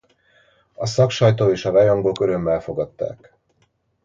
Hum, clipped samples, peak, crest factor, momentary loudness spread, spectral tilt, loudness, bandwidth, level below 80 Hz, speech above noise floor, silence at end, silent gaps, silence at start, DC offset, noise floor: none; under 0.1%; -2 dBFS; 18 dB; 12 LU; -6.5 dB/octave; -19 LUFS; 7.6 kHz; -50 dBFS; 47 dB; 0.9 s; none; 0.8 s; under 0.1%; -65 dBFS